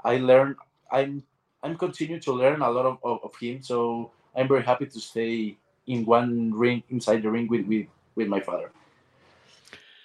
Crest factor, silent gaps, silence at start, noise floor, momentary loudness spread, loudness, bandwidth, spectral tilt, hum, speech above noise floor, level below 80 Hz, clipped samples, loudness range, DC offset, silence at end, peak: 20 dB; none; 0.05 s; -60 dBFS; 13 LU; -26 LUFS; 11 kHz; -6.5 dB/octave; none; 36 dB; -72 dBFS; under 0.1%; 3 LU; under 0.1%; 0.3 s; -6 dBFS